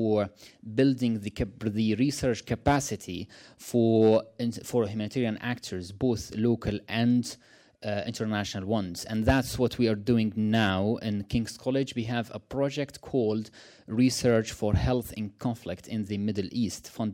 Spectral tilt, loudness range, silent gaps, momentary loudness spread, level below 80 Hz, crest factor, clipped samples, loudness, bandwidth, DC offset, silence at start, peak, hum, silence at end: -6 dB/octave; 3 LU; none; 10 LU; -48 dBFS; 16 dB; under 0.1%; -28 LUFS; 16.5 kHz; under 0.1%; 0 s; -12 dBFS; none; 0 s